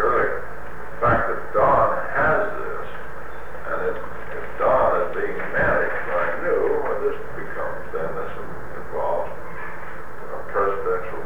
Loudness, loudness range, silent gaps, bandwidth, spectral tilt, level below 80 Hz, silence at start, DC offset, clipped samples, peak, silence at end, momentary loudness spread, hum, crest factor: -23 LUFS; 6 LU; none; over 20 kHz; -7 dB/octave; -44 dBFS; 0 s; 6%; under 0.1%; -6 dBFS; 0 s; 16 LU; none; 16 dB